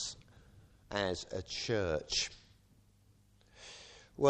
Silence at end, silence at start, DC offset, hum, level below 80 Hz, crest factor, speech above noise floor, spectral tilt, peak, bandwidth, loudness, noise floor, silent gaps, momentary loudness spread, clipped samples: 0 s; 0 s; under 0.1%; 50 Hz at -65 dBFS; -60 dBFS; 24 dB; 30 dB; -3.5 dB/octave; -14 dBFS; 10 kHz; -36 LUFS; -66 dBFS; none; 19 LU; under 0.1%